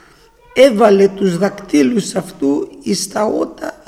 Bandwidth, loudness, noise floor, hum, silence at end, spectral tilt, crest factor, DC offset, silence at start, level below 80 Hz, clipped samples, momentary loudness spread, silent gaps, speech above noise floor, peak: 15 kHz; -15 LUFS; -46 dBFS; none; 0.15 s; -5 dB/octave; 14 dB; under 0.1%; 0.55 s; -52 dBFS; under 0.1%; 10 LU; none; 32 dB; 0 dBFS